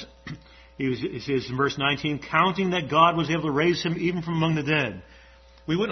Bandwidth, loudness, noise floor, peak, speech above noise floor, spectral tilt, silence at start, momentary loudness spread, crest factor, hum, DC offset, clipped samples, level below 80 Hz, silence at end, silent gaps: 6.4 kHz; -24 LUFS; -51 dBFS; -6 dBFS; 27 dB; -6 dB/octave; 0 s; 19 LU; 20 dB; none; under 0.1%; under 0.1%; -54 dBFS; 0 s; none